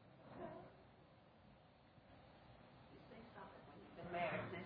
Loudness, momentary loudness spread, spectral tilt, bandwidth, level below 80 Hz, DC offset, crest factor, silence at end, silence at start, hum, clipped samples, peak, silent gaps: -52 LUFS; 23 LU; -4.5 dB/octave; 4.9 kHz; -76 dBFS; under 0.1%; 22 dB; 0 s; 0 s; none; under 0.1%; -32 dBFS; none